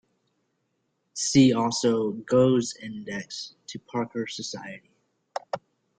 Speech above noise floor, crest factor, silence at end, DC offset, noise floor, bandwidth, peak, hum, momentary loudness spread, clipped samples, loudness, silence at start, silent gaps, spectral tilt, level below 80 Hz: 50 dB; 20 dB; 0.4 s; under 0.1%; -75 dBFS; 9.4 kHz; -6 dBFS; none; 19 LU; under 0.1%; -25 LUFS; 1.15 s; none; -5 dB/octave; -64 dBFS